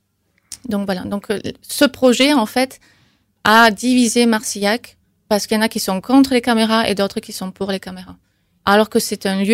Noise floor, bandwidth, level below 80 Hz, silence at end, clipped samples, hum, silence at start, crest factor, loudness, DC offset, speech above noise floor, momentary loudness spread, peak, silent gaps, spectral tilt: -64 dBFS; 16 kHz; -52 dBFS; 0 s; under 0.1%; none; 0.5 s; 16 dB; -16 LUFS; under 0.1%; 48 dB; 12 LU; -2 dBFS; none; -3.5 dB/octave